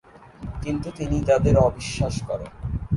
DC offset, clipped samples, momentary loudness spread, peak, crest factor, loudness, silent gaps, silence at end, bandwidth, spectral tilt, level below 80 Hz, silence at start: under 0.1%; under 0.1%; 14 LU; -4 dBFS; 18 dB; -24 LUFS; none; 0 s; 11.5 kHz; -7 dB/octave; -34 dBFS; 0.2 s